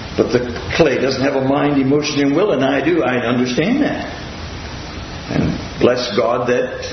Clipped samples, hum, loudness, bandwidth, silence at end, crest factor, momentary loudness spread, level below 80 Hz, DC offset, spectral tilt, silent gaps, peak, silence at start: under 0.1%; none; -16 LUFS; 6.4 kHz; 0 s; 16 dB; 13 LU; -38 dBFS; under 0.1%; -5.5 dB/octave; none; 0 dBFS; 0 s